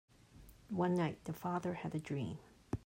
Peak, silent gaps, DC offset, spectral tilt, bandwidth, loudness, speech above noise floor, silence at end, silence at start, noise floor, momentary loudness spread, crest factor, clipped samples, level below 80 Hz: -22 dBFS; none; under 0.1%; -7.5 dB/octave; 16 kHz; -40 LUFS; 22 dB; 0 s; 0.35 s; -60 dBFS; 11 LU; 18 dB; under 0.1%; -64 dBFS